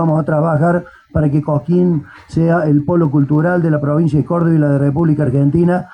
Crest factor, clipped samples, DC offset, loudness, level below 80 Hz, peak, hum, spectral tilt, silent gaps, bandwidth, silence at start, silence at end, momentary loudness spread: 10 dB; under 0.1%; under 0.1%; -14 LUFS; -42 dBFS; -4 dBFS; none; -10.5 dB/octave; none; 8.8 kHz; 0 s; 0.05 s; 4 LU